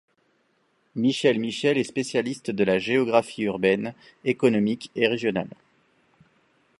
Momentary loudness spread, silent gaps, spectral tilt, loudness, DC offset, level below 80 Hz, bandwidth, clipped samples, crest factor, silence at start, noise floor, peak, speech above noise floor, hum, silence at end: 8 LU; none; -5.5 dB/octave; -24 LUFS; under 0.1%; -66 dBFS; 11.5 kHz; under 0.1%; 22 dB; 0.95 s; -68 dBFS; -4 dBFS; 44 dB; none; 1.3 s